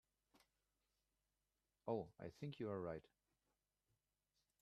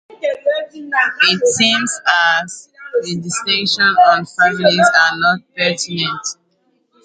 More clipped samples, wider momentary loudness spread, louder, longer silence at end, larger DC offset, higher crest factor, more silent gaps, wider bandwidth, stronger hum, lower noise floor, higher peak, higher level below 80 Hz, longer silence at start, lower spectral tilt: neither; second, 8 LU vs 11 LU; second, -50 LUFS vs -14 LUFS; first, 1.6 s vs 0.7 s; neither; first, 24 dB vs 16 dB; neither; first, 12 kHz vs 9.6 kHz; neither; first, under -90 dBFS vs -62 dBFS; second, -30 dBFS vs 0 dBFS; second, -82 dBFS vs -62 dBFS; first, 1.85 s vs 0.1 s; first, -8 dB/octave vs -2.5 dB/octave